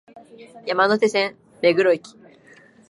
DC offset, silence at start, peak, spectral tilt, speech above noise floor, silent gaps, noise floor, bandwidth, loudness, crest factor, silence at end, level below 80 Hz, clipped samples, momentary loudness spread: under 0.1%; 0.15 s; -4 dBFS; -4.5 dB/octave; 30 dB; none; -51 dBFS; 11.5 kHz; -20 LUFS; 18 dB; 0.9 s; -72 dBFS; under 0.1%; 9 LU